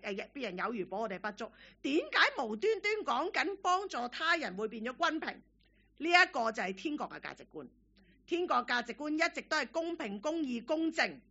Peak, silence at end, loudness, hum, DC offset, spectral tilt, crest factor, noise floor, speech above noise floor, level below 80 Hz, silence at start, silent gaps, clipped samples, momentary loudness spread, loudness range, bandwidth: -10 dBFS; 0.1 s; -33 LUFS; none; under 0.1%; -1 dB/octave; 24 dB; -66 dBFS; 32 dB; -72 dBFS; 0.05 s; none; under 0.1%; 13 LU; 3 LU; 8 kHz